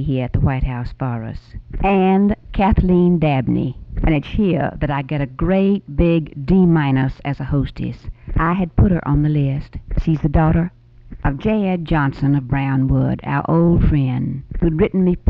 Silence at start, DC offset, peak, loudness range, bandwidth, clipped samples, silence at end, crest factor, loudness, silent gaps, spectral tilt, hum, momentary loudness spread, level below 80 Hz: 0 s; under 0.1%; -4 dBFS; 2 LU; 5.2 kHz; under 0.1%; 0 s; 14 dB; -18 LUFS; none; -10.5 dB/octave; none; 10 LU; -26 dBFS